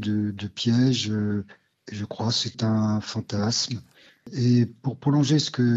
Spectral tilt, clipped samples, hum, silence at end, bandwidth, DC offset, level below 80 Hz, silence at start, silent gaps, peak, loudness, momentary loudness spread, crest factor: -5.5 dB/octave; under 0.1%; none; 0 s; 8 kHz; under 0.1%; -68 dBFS; 0 s; none; -8 dBFS; -24 LUFS; 13 LU; 16 dB